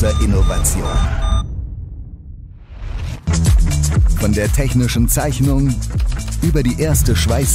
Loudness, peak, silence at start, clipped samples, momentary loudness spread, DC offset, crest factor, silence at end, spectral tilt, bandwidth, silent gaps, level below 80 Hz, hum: -17 LUFS; -2 dBFS; 0 s; under 0.1%; 16 LU; under 0.1%; 12 dB; 0 s; -5.5 dB/octave; 16 kHz; none; -18 dBFS; none